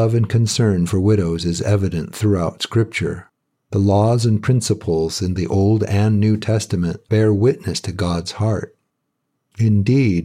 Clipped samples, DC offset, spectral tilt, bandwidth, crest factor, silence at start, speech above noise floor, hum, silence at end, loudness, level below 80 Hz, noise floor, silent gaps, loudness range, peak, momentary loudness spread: under 0.1%; under 0.1%; -6.5 dB/octave; 13.5 kHz; 14 dB; 0 s; 56 dB; none; 0 s; -18 LUFS; -44 dBFS; -73 dBFS; none; 2 LU; -4 dBFS; 7 LU